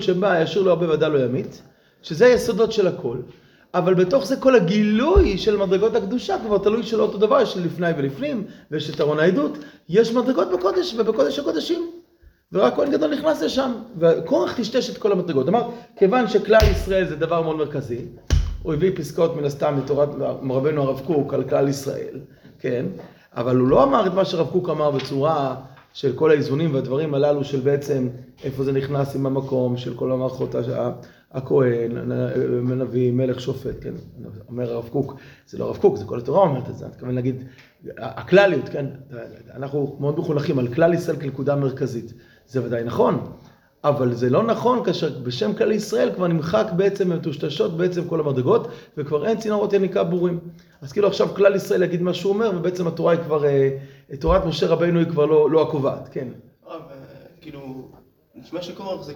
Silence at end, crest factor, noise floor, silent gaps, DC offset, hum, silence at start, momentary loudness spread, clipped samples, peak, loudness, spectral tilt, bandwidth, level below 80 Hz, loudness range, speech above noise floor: 0 s; 20 dB; -54 dBFS; none; under 0.1%; none; 0 s; 15 LU; under 0.1%; 0 dBFS; -21 LUFS; -7 dB/octave; 18.5 kHz; -38 dBFS; 5 LU; 33 dB